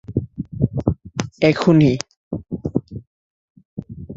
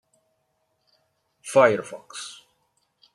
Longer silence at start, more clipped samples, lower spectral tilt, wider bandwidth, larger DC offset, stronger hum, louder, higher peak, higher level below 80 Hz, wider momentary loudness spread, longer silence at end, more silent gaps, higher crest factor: second, 0.1 s vs 1.45 s; neither; first, -7 dB/octave vs -4 dB/octave; second, 7.8 kHz vs 12 kHz; neither; neither; about the same, -20 LUFS vs -20 LUFS; about the same, -2 dBFS vs -4 dBFS; first, -42 dBFS vs -76 dBFS; about the same, 22 LU vs 21 LU; second, 0 s vs 0.85 s; first, 2.17-2.31 s, 3.07-3.55 s, 3.65-3.77 s vs none; about the same, 20 dB vs 24 dB